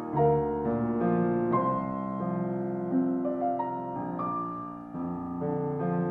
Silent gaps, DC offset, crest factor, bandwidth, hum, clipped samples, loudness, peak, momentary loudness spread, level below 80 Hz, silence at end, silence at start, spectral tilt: none; under 0.1%; 16 dB; 3.7 kHz; none; under 0.1%; -30 LUFS; -12 dBFS; 8 LU; -56 dBFS; 0 s; 0 s; -11.5 dB/octave